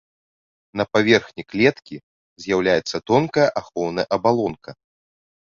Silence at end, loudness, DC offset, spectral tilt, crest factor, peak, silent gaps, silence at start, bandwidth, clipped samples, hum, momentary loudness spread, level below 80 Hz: 0.9 s; -20 LUFS; under 0.1%; -5.5 dB/octave; 20 dB; -2 dBFS; 2.03-2.36 s; 0.75 s; 7.6 kHz; under 0.1%; none; 18 LU; -56 dBFS